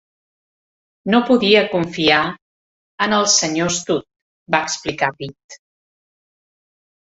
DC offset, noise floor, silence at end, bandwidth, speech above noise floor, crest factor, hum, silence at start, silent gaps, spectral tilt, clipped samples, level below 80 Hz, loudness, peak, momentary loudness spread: under 0.1%; under -90 dBFS; 1.55 s; 8.2 kHz; over 73 dB; 18 dB; none; 1.05 s; 2.42-2.98 s, 4.22-4.46 s, 5.44-5.49 s; -3 dB/octave; under 0.1%; -58 dBFS; -17 LUFS; -2 dBFS; 10 LU